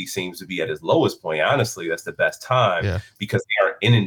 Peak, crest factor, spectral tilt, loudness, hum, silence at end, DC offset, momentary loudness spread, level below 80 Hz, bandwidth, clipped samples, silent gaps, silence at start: -6 dBFS; 16 dB; -5 dB/octave; -22 LUFS; none; 0 s; under 0.1%; 9 LU; -54 dBFS; 18.5 kHz; under 0.1%; none; 0 s